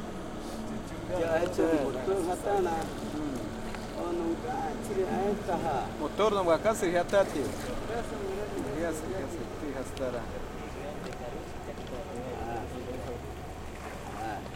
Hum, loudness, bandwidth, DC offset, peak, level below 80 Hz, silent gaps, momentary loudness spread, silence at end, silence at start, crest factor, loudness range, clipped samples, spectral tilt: none; -33 LUFS; 16.5 kHz; under 0.1%; -12 dBFS; -46 dBFS; none; 12 LU; 0 s; 0 s; 20 dB; 9 LU; under 0.1%; -5.5 dB/octave